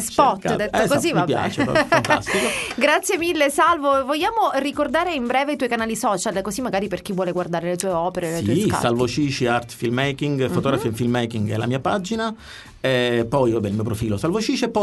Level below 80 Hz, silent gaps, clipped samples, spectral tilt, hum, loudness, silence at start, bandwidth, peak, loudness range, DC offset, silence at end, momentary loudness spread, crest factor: -48 dBFS; none; under 0.1%; -5 dB/octave; none; -21 LUFS; 0 s; 12.5 kHz; 0 dBFS; 4 LU; under 0.1%; 0 s; 6 LU; 20 dB